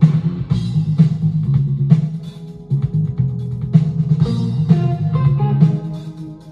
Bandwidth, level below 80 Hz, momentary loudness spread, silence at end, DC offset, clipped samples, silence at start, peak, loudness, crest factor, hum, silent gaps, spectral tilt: 5.6 kHz; -40 dBFS; 13 LU; 0 s; under 0.1%; under 0.1%; 0 s; 0 dBFS; -17 LUFS; 16 dB; none; none; -10 dB/octave